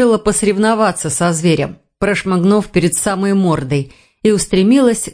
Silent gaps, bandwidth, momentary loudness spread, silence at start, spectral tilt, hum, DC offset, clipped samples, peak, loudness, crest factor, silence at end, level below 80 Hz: none; 10.5 kHz; 7 LU; 0 s; -5 dB/octave; none; under 0.1%; under 0.1%; 0 dBFS; -14 LUFS; 14 dB; 0 s; -40 dBFS